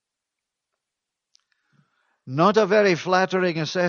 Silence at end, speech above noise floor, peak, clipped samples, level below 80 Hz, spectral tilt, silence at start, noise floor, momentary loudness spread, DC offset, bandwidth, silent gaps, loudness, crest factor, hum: 0 s; 65 dB; -4 dBFS; under 0.1%; -72 dBFS; -5.5 dB/octave; 2.25 s; -85 dBFS; 6 LU; under 0.1%; 7.2 kHz; none; -20 LUFS; 20 dB; none